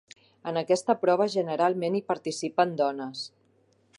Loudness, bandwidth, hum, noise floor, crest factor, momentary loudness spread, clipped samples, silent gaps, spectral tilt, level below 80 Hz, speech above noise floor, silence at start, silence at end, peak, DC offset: -27 LUFS; 11.5 kHz; none; -65 dBFS; 20 dB; 12 LU; under 0.1%; none; -5 dB/octave; -80 dBFS; 39 dB; 0.45 s; 0.7 s; -8 dBFS; under 0.1%